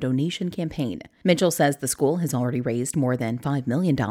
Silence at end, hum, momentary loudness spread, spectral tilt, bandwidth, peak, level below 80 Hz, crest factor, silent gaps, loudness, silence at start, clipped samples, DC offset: 0 s; none; 7 LU; -5.5 dB/octave; 17 kHz; -6 dBFS; -56 dBFS; 18 dB; none; -24 LUFS; 0 s; under 0.1%; under 0.1%